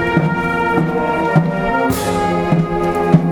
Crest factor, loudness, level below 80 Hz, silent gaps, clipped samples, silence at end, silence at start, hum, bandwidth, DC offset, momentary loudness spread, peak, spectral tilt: 16 dB; -16 LUFS; -36 dBFS; none; under 0.1%; 0 s; 0 s; none; 19 kHz; under 0.1%; 3 LU; 0 dBFS; -7 dB/octave